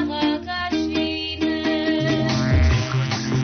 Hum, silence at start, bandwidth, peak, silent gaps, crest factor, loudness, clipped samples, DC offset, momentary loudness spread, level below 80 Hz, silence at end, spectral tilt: none; 0 s; 6.6 kHz; -10 dBFS; none; 10 dB; -21 LUFS; under 0.1%; under 0.1%; 5 LU; -32 dBFS; 0 s; -5 dB/octave